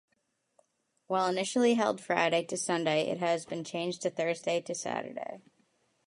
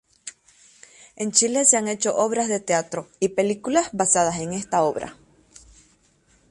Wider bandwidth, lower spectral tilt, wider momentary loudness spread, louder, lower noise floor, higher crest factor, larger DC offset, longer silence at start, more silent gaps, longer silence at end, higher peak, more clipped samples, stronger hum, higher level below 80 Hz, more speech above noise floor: about the same, 11.5 kHz vs 11.5 kHz; about the same, -4 dB/octave vs -3 dB/octave; second, 9 LU vs 16 LU; second, -31 LUFS vs -21 LUFS; first, -78 dBFS vs -61 dBFS; about the same, 22 dB vs 22 dB; neither; first, 1.1 s vs 0.25 s; neither; second, 0.65 s vs 1.35 s; second, -10 dBFS vs -2 dBFS; neither; neither; second, -82 dBFS vs -60 dBFS; first, 47 dB vs 39 dB